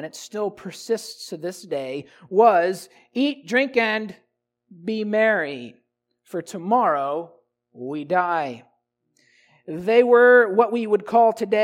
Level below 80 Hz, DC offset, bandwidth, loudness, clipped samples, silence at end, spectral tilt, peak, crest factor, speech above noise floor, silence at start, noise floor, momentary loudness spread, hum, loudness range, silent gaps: -74 dBFS; under 0.1%; 15 kHz; -20 LUFS; under 0.1%; 0 s; -5 dB/octave; -4 dBFS; 18 dB; 49 dB; 0 s; -70 dBFS; 18 LU; none; 6 LU; none